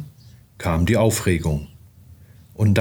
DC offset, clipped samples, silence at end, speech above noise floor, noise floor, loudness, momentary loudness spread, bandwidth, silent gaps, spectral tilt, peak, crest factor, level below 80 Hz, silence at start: under 0.1%; under 0.1%; 0 s; 28 dB; -47 dBFS; -21 LUFS; 23 LU; over 20 kHz; none; -6 dB/octave; -4 dBFS; 18 dB; -40 dBFS; 0 s